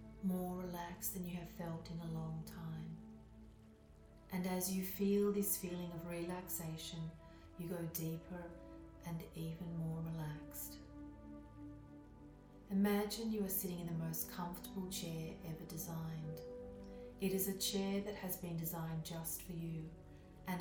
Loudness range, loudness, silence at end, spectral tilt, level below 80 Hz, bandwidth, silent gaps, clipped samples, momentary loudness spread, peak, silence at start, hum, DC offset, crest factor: 7 LU; -43 LUFS; 0 s; -5 dB/octave; -62 dBFS; 19 kHz; none; under 0.1%; 19 LU; -24 dBFS; 0 s; none; under 0.1%; 18 dB